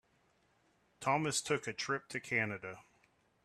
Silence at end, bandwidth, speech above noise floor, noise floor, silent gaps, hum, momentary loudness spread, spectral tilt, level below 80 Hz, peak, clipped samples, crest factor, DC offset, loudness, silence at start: 0.65 s; 14 kHz; 37 dB; -74 dBFS; none; none; 12 LU; -3.5 dB/octave; -76 dBFS; -18 dBFS; under 0.1%; 20 dB; under 0.1%; -36 LUFS; 1 s